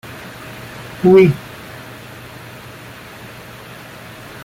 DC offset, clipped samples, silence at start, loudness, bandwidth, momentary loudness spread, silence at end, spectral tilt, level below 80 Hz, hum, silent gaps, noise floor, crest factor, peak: under 0.1%; under 0.1%; 0.1 s; -12 LUFS; 16 kHz; 24 LU; 3.05 s; -7.5 dB/octave; -50 dBFS; none; none; -36 dBFS; 18 dB; -2 dBFS